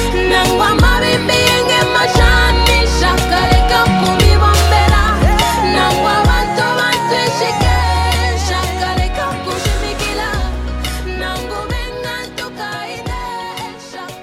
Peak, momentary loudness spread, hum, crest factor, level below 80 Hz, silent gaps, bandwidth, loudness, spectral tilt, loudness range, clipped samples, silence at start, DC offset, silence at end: 0 dBFS; 13 LU; none; 14 dB; -20 dBFS; none; 16.5 kHz; -13 LUFS; -4.5 dB/octave; 10 LU; under 0.1%; 0 s; under 0.1%; 0 s